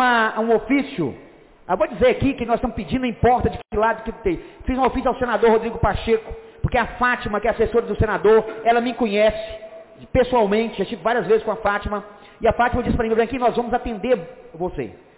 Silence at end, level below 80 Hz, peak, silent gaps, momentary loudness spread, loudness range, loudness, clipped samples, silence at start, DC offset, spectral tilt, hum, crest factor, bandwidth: 0.2 s; -36 dBFS; -8 dBFS; none; 10 LU; 2 LU; -21 LUFS; under 0.1%; 0 s; under 0.1%; -10 dB/octave; none; 12 dB; 4 kHz